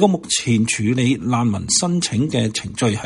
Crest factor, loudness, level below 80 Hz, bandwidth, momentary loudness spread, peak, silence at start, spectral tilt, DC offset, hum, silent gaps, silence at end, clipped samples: 16 dB; -18 LUFS; -48 dBFS; 11.5 kHz; 4 LU; -2 dBFS; 0 s; -4.5 dB/octave; under 0.1%; none; none; 0 s; under 0.1%